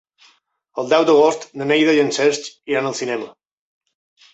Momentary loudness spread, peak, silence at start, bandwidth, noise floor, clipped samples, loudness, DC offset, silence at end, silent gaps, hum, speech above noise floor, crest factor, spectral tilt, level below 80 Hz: 14 LU; -2 dBFS; 0.75 s; 8.2 kHz; -58 dBFS; under 0.1%; -18 LUFS; under 0.1%; 1.05 s; none; none; 41 dB; 16 dB; -4 dB/octave; -68 dBFS